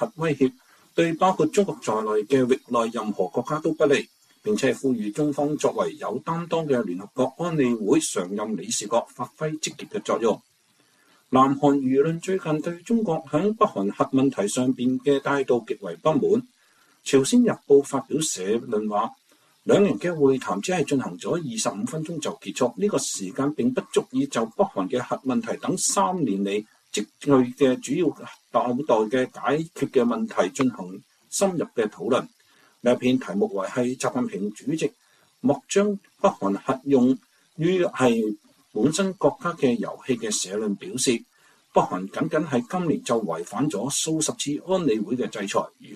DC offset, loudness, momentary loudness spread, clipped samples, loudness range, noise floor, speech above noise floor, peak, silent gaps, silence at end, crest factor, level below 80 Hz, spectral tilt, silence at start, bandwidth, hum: under 0.1%; -24 LUFS; 8 LU; under 0.1%; 3 LU; -63 dBFS; 39 dB; -6 dBFS; none; 0 s; 18 dB; -66 dBFS; -5 dB/octave; 0 s; 14 kHz; none